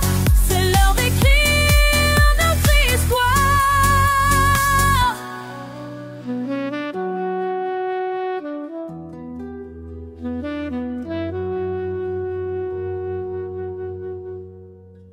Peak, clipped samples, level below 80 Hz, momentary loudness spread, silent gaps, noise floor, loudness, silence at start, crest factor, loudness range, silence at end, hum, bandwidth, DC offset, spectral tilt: -2 dBFS; under 0.1%; -24 dBFS; 18 LU; none; -43 dBFS; -19 LUFS; 0 s; 16 dB; 13 LU; 0.15 s; none; 16.5 kHz; under 0.1%; -4 dB/octave